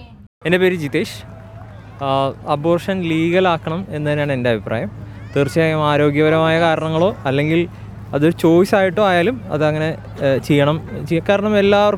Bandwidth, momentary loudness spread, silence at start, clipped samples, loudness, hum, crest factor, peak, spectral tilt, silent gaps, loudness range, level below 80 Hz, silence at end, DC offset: 15.5 kHz; 12 LU; 0 s; under 0.1%; -17 LUFS; none; 14 dB; -2 dBFS; -7 dB/octave; 0.27-0.41 s; 4 LU; -44 dBFS; 0 s; under 0.1%